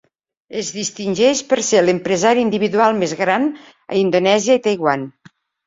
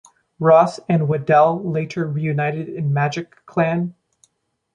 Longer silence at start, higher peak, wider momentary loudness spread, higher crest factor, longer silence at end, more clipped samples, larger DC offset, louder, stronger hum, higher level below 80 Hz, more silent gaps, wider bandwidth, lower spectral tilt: about the same, 0.5 s vs 0.4 s; about the same, -2 dBFS vs -2 dBFS; about the same, 9 LU vs 10 LU; about the same, 16 dB vs 18 dB; second, 0.55 s vs 0.85 s; neither; neither; about the same, -17 LUFS vs -19 LUFS; neither; about the same, -60 dBFS vs -62 dBFS; neither; second, 7.8 kHz vs 9.6 kHz; second, -4 dB/octave vs -8 dB/octave